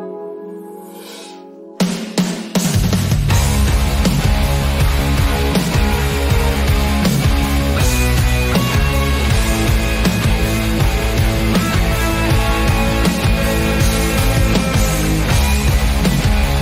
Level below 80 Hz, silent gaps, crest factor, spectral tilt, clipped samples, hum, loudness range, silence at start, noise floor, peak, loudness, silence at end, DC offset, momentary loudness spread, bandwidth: -18 dBFS; none; 12 dB; -5 dB/octave; under 0.1%; none; 1 LU; 0 s; -35 dBFS; -4 dBFS; -16 LUFS; 0 s; under 0.1%; 4 LU; 16 kHz